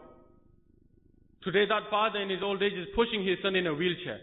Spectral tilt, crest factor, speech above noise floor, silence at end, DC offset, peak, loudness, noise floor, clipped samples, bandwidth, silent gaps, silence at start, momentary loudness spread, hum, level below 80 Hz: -9 dB/octave; 18 dB; 33 dB; 0 s; under 0.1%; -12 dBFS; -29 LUFS; -62 dBFS; under 0.1%; 4.1 kHz; none; 0 s; 4 LU; none; -58 dBFS